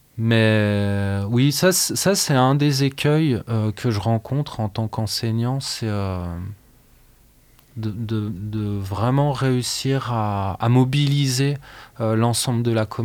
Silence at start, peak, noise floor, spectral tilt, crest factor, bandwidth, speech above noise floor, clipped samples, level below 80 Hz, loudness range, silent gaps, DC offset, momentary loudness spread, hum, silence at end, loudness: 0.15 s; -4 dBFS; -53 dBFS; -5 dB/octave; 16 dB; 19.5 kHz; 33 dB; under 0.1%; -52 dBFS; 8 LU; none; under 0.1%; 10 LU; none; 0 s; -21 LUFS